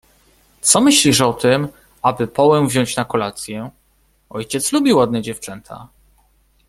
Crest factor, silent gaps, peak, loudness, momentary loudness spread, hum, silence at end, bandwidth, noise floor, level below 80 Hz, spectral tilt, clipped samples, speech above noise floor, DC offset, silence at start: 18 dB; none; 0 dBFS; -15 LUFS; 20 LU; none; 0.8 s; 15.5 kHz; -59 dBFS; -52 dBFS; -3.5 dB/octave; under 0.1%; 42 dB; under 0.1%; 0.65 s